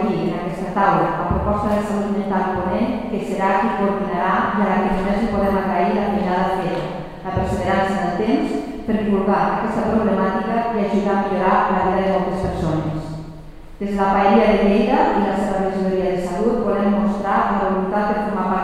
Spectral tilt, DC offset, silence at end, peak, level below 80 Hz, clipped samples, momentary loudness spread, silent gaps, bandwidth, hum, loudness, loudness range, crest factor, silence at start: -7.5 dB/octave; 0.4%; 0 s; -2 dBFS; -36 dBFS; under 0.1%; 7 LU; none; 11 kHz; none; -19 LUFS; 3 LU; 16 dB; 0 s